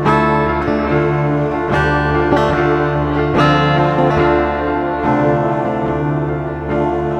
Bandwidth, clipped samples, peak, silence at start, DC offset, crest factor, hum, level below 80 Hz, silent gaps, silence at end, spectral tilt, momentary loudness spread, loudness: 8.4 kHz; under 0.1%; 0 dBFS; 0 s; under 0.1%; 14 dB; none; -30 dBFS; none; 0 s; -8 dB/octave; 5 LU; -15 LUFS